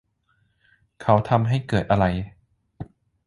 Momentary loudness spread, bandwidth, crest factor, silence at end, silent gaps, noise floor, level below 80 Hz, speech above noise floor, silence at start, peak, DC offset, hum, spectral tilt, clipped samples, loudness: 22 LU; 11 kHz; 22 dB; 0.45 s; none; -67 dBFS; -44 dBFS; 47 dB; 1 s; -2 dBFS; under 0.1%; none; -8 dB/octave; under 0.1%; -22 LUFS